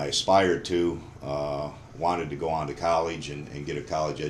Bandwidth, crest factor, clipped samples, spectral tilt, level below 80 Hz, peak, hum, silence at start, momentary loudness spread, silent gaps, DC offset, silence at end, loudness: 12.5 kHz; 18 dB; under 0.1%; -4.5 dB/octave; -50 dBFS; -8 dBFS; none; 0 s; 13 LU; none; under 0.1%; 0 s; -28 LUFS